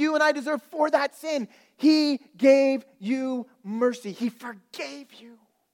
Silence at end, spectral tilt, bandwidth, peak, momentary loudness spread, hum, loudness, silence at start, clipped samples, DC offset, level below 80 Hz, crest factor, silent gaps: 0.45 s; -4.5 dB/octave; 15.5 kHz; -6 dBFS; 16 LU; none; -24 LUFS; 0 s; under 0.1%; under 0.1%; -88 dBFS; 18 dB; none